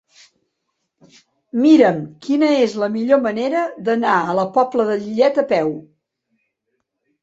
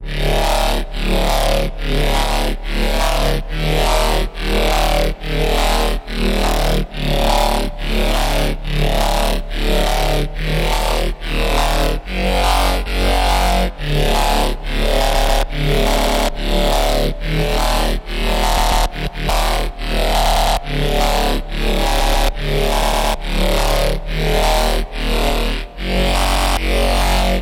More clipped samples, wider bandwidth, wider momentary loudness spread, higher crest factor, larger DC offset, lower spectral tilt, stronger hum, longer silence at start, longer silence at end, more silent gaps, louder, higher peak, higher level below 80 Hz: neither; second, 7.8 kHz vs 17 kHz; first, 9 LU vs 5 LU; about the same, 18 dB vs 14 dB; neither; first, -6.5 dB/octave vs -4 dB/octave; neither; first, 1.55 s vs 0 s; first, 1.4 s vs 0 s; neither; about the same, -17 LUFS vs -18 LUFS; about the same, 0 dBFS vs -2 dBFS; second, -66 dBFS vs -18 dBFS